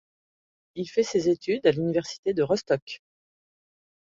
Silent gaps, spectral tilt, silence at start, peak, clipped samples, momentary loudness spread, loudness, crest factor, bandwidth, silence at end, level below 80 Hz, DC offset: 2.18-2.23 s, 2.82-2.87 s; -5.5 dB/octave; 0.75 s; -8 dBFS; under 0.1%; 15 LU; -26 LUFS; 20 dB; 7.8 kHz; 1.2 s; -64 dBFS; under 0.1%